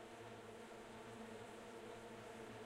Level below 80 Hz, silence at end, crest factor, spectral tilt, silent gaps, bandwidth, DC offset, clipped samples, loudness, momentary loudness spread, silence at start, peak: -76 dBFS; 0 s; 12 dB; -4.5 dB/octave; none; 16 kHz; under 0.1%; under 0.1%; -55 LUFS; 2 LU; 0 s; -42 dBFS